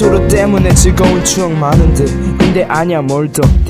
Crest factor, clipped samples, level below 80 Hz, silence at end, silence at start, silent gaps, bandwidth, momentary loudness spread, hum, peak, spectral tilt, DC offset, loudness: 10 dB; 0.5%; -16 dBFS; 0 s; 0 s; none; 16 kHz; 5 LU; none; 0 dBFS; -5.5 dB/octave; under 0.1%; -10 LUFS